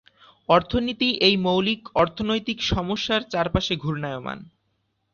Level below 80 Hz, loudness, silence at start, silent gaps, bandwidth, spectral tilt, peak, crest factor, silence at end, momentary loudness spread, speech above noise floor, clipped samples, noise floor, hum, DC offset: -42 dBFS; -23 LUFS; 0.5 s; none; 7.2 kHz; -5.5 dB/octave; -4 dBFS; 20 dB; 0.7 s; 11 LU; 49 dB; under 0.1%; -72 dBFS; none; under 0.1%